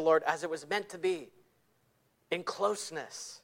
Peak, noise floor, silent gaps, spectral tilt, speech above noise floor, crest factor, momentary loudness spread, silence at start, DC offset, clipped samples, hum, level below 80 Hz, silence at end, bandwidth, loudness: -14 dBFS; -72 dBFS; none; -3 dB/octave; 39 dB; 20 dB; 11 LU; 0 s; under 0.1%; under 0.1%; none; -80 dBFS; 0.05 s; 16.5 kHz; -34 LUFS